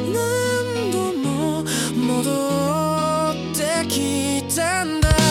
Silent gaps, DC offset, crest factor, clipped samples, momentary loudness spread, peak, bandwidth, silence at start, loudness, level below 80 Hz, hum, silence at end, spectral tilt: none; under 0.1%; 16 dB; under 0.1%; 2 LU; -4 dBFS; 17.5 kHz; 0 s; -21 LUFS; -34 dBFS; none; 0 s; -4.5 dB/octave